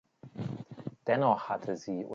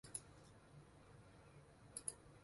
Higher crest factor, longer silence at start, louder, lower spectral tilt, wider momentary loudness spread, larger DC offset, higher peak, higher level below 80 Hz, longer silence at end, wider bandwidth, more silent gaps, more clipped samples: second, 20 dB vs 30 dB; first, 0.25 s vs 0.05 s; first, -33 LUFS vs -56 LUFS; first, -7 dB/octave vs -2.5 dB/octave; about the same, 15 LU vs 15 LU; neither; first, -14 dBFS vs -28 dBFS; about the same, -74 dBFS vs -74 dBFS; about the same, 0 s vs 0 s; second, 7.6 kHz vs 11.5 kHz; neither; neither